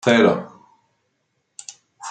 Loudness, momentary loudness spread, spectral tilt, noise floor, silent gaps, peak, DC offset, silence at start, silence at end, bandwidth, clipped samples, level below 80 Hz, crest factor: -18 LUFS; 25 LU; -5 dB/octave; -71 dBFS; none; -2 dBFS; under 0.1%; 0.05 s; 0 s; 9.2 kHz; under 0.1%; -68 dBFS; 20 dB